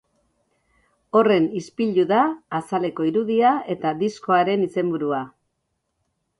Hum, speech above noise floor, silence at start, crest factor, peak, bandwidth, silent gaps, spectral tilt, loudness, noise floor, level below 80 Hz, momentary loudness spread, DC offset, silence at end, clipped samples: none; 55 dB; 1.15 s; 18 dB; -6 dBFS; 11.5 kHz; none; -7 dB/octave; -21 LUFS; -75 dBFS; -66 dBFS; 7 LU; under 0.1%; 1.1 s; under 0.1%